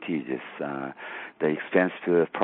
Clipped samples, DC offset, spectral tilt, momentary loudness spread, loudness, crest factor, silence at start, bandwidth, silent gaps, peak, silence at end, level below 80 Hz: under 0.1%; under 0.1%; -5 dB/octave; 12 LU; -28 LUFS; 20 dB; 0 s; 4.1 kHz; none; -6 dBFS; 0 s; -74 dBFS